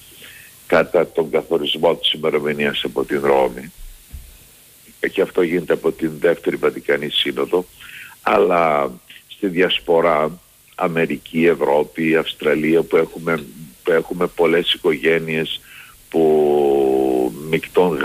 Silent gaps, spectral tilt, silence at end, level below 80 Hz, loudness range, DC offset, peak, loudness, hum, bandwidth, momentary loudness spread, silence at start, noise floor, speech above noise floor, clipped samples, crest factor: none; -5 dB/octave; 0 s; -50 dBFS; 3 LU; under 0.1%; -4 dBFS; -18 LUFS; none; 15.5 kHz; 10 LU; 0.2 s; -47 dBFS; 29 dB; under 0.1%; 14 dB